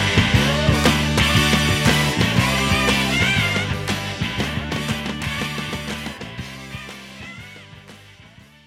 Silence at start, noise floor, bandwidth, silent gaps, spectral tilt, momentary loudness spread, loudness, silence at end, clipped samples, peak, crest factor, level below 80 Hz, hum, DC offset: 0 s; -46 dBFS; 16.5 kHz; none; -4 dB/octave; 17 LU; -19 LUFS; 0.7 s; under 0.1%; 0 dBFS; 20 dB; -34 dBFS; none; under 0.1%